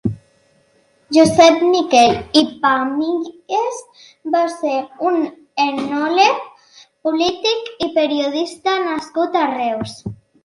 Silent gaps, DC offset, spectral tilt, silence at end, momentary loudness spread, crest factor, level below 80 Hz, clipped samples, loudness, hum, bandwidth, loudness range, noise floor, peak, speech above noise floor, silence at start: none; under 0.1%; -4 dB/octave; 0.3 s; 13 LU; 18 dB; -52 dBFS; under 0.1%; -17 LUFS; none; 11.5 kHz; 5 LU; -57 dBFS; 0 dBFS; 41 dB; 0.05 s